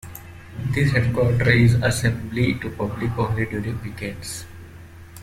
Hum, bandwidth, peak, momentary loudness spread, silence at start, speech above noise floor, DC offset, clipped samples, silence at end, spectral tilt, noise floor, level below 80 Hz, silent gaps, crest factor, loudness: none; 15 kHz; -4 dBFS; 22 LU; 0.05 s; 21 dB; under 0.1%; under 0.1%; 0 s; -6 dB/octave; -41 dBFS; -42 dBFS; none; 18 dB; -22 LUFS